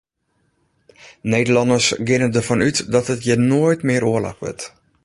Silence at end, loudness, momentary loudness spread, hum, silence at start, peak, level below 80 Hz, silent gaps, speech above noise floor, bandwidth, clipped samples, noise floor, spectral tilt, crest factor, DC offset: 0.35 s; -17 LUFS; 13 LU; none; 1.05 s; -2 dBFS; -50 dBFS; none; 50 dB; 11.5 kHz; under 0.1%; -67 dBFS; -5 dB/octave; 16 dB; under 0.1%